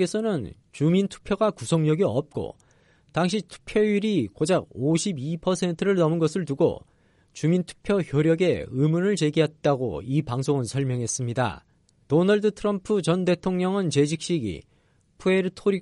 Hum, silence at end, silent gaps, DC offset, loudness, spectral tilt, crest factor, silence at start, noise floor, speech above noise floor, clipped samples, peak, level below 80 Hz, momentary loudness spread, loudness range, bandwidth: none; 0 s; none; under 0.1%; -24 LUFS; -6 dB/octave; 16 dB; 0 s; -63 dBFS; 39 dB; under 0.1%; -10 dBFS; -54 dBFS; 7 LU; 2 LU; 11.5 kHz